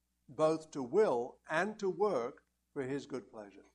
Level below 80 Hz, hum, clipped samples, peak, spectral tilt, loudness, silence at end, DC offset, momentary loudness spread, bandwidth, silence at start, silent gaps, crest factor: -76 dBFS; none; under 0.1%; -16 dBFS; -5.5 dB/octave; -35 LUFS; 0.15 s; under 0.1%; 16 LU; 10.5 kHz; 0.3 s; none; 20 dB